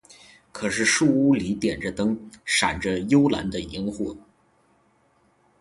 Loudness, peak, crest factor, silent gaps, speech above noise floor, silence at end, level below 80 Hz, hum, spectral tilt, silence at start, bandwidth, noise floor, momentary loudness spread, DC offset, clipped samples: -23 LUFS; -6 dBFS; 18 dB; none; 40 dB; 1.4 s; -50 dBFS; none; -4 dB/octave; 0.55 s; 11.5 kHz; -63 dBFS; 12 LU; under 0.1%; under 0.1%